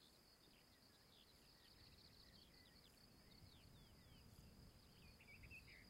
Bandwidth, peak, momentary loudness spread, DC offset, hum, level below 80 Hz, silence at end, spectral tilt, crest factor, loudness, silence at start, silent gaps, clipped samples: 16 kHz; -50 dBFS; 6 LU; under 0.1%; none; -76 dBFS; 0 s; -3.5 dB/octave; 16 dB; -67 LUFS; 0 s; none; under 0.1%